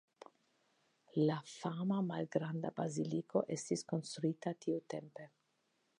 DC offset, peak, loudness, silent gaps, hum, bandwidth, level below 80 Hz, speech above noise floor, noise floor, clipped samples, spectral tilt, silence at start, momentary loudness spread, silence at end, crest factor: under 0.1%; -20 dBFS; -39 LUFS; none; none; 11 kHz; -86 dBFS; 42 dB; -80 dBFS; under 0.1%; -6.5 dB/octave; 1.15 s; 9 LU; 0.75 s; 20 dB